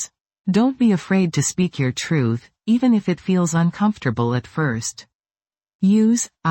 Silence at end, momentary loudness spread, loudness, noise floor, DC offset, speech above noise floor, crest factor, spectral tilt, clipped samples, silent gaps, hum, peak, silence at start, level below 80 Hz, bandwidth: 0 s; 6 LU; -20 LUFS; under -90 dBFS; under 0.1%; over 71 dB; 14 dB; -5.5 dB/octave; under 0.1%; 0.21-0.25 s, 5.15-5.20 s, 5.75-5.79 s; none; -6 dBFS; 0 s; -56 dBFS; 16.5 kHz